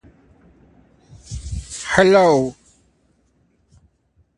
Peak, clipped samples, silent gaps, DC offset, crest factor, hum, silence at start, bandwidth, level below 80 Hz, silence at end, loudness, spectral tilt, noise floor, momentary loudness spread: 0 dBFS; under 0.1%; none; under 0.1%; 22 dB; none; 1.3 s; 11 kHz; -40 dBFS; 1.85 s; -17 LUFS; -5 dB/octave; -62 dBFS; 20 LU